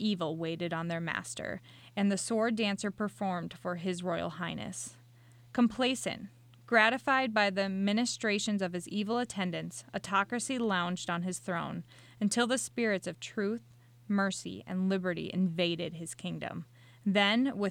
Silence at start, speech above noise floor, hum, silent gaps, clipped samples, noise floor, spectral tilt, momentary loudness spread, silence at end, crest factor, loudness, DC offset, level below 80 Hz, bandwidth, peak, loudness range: 0 s; 25 dB; none; none; under 0.1%; -58 dBFS; -4.5 dB/octave; 12 LU; 0 s; 22 dB; -32 LUFS; under 0.1%; -70 dBFS; 15 kHz; -10 dBFS; 5 LU